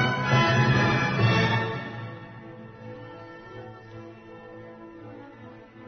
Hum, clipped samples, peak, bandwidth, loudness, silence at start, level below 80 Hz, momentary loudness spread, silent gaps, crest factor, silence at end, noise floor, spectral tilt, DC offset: none; under 0.1%; -10 dBFS; 6.6 kHz; -23 LUFS; 0 s; -54 dBFS; 23 LU; none; 16 dB; 0 s; -46 dBFS; -6 dB/octave; under 0.1%